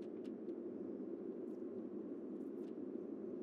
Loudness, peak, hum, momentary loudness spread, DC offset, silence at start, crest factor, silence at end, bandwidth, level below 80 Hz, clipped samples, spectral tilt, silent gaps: -48 LUFS; -34 dBFS; none; 1 LU; under 0.1%; 0 s; 12 dB; 0 s; 6 kHz; under -90 dBFS; under 0.1%; -9.5 dB/octave; none